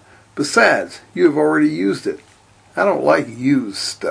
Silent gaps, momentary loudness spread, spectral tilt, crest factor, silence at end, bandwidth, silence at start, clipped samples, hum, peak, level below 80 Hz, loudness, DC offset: none; 14 LU; -4.5 dB/octave; 18 dB; 0 s; 10.5 kHz; 0.35 s; under 0.1%; none; 0 dBFS; -62 dBFS; -17 LUFS; under 0.1%